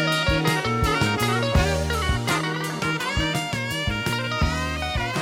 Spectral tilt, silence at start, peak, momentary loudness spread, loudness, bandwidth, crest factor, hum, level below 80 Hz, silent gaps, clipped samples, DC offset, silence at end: -4.5 dB/octave; 0 s; -6 dBFS; 5 LU; -23 LUFS; 16.5 kHz; 16 dB; none; -32 dBFS; none; under 0.1%; under 0.1%; 0 s